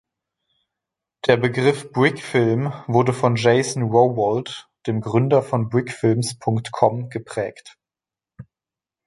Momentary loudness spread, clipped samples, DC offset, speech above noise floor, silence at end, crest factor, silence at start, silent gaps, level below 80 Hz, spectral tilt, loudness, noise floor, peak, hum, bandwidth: 10 LU; under 0.1%; under 0.1%; 70 dB; 0.65 s; 20 dB; 1.25 s; none; -60 dBFS; -6 dB/octave; -20 LUFS; -90 dBFS; -2 dBFS; none; 11.5 kHz